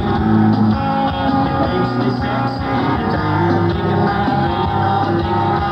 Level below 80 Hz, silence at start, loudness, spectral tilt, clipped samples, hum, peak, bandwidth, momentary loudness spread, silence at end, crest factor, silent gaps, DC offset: -34 dBFS; 0 s; -16 LUFS; -8.5 dB/octave; under 0.1%; none; -2 dBFS; 6.4 kHz; 4 LU; 0 s; 12 dB; none; under 0.1%